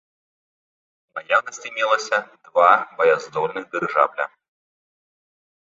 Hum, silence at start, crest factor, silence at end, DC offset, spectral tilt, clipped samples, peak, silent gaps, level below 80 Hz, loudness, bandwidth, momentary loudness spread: none; 1.15 s; 22 dB; 1.35 s; under 0.1%; -3 dB/octave; under 0.1%; -2 dBFS; none; -74 dBFS; -20 LUFS; 7.8 kHz; 14 LU